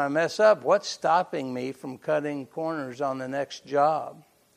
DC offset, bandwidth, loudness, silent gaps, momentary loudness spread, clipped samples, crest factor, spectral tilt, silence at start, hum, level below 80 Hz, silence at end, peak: under 0.1%; 13 kHz; -26 LUFS; none; 12 LU; under 0.1%; 18 dB; -4.5 dB/octave; 0 s; none; -78 dBFS; 0.35 s; -8 dBFS